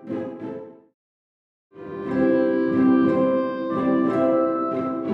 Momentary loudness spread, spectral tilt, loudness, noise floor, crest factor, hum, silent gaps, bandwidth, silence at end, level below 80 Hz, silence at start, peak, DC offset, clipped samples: 16 LU; -9.5 dB/octave; -21 LUFS; under -90 dBFS; 14 dB; none; 0.94-1.70 s; 5 kHz; 0 s; -64 dBFS; 0 s; -8 dBFS; under 0.1%; under 0.1%